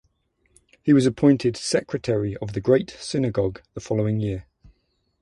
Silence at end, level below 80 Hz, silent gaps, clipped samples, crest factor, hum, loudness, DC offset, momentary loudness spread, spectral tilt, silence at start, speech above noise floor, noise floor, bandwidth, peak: 0.8 s; -50 dBFS; none; under 0.1%; 18 dB; none; -23 LUFS; under 0.1%; 10 LU; -6.5 dB/octave; 0.85 s; 48 dB; -69 dBFS; 11.5 kHz; -4 dBFS